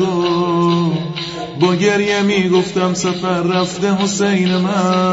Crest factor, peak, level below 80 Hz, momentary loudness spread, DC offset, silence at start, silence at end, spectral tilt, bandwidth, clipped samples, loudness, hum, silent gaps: 14 dB; -2 dBFS; -52 dBFS; 4 LU; under 0.1%; 0 s; 0 s; -5.5 dB/octave; 8 kHz; under 0.1%; -16 LUFS; none; none